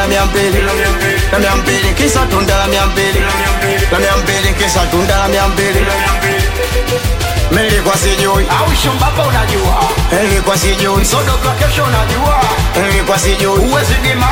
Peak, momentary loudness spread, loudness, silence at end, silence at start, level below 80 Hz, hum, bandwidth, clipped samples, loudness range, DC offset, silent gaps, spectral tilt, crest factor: 0 dBFS; 2 LU; -12 LUFS; 0 s; 0 s; -18 dBFS; none; 17 kHz; under 0.1%; 1 LU; under 0.1%; none; -4 dB/octave; 12 dB